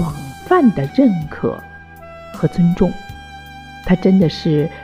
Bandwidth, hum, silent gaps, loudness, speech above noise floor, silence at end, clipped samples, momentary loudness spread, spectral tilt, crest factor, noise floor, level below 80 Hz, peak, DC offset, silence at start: 15 kHz; none; none; -16 LUFS; 22 dB; 0 s; under 0.1%; 21 LU; -8 dB/octave; 14 dB; -37 dBFS; -38 dBFS; -2 dBFS; under 0.1%; 0 s